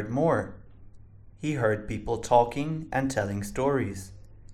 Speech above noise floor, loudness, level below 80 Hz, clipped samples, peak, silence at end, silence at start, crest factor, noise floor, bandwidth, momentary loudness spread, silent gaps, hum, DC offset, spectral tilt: 22 dB; -28 LUFS; -50 dBFS; under 0.1%; -6 dBFS; 0 s; 0 s; 22 dB; -49 dBFS; 16 kHz; 12 LU; none; none; under 0.1%; -6.5 dB/octave